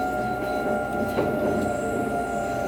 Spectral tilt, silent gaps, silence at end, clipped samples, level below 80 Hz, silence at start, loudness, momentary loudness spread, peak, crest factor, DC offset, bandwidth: -6 dB/octave; none; 0 s; under 0.1%; -46 dBFS; 0 s; -26 LUFS; 2 LU; -12 dBFS; 12 dB; under 0.1%; 20 kHz